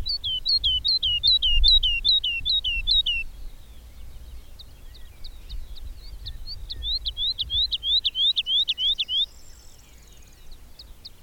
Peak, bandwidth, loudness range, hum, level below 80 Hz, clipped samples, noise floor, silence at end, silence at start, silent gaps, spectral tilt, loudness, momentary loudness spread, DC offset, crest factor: -8 dBFS; 16.5 kHz; 16 LU; none; -34 dBFS; under 0.1%; -47 dBFS; 0 s; 0 s; none; -1 dB/octave; -21 LUFS; 22 LU; under 0.1%; 18 dB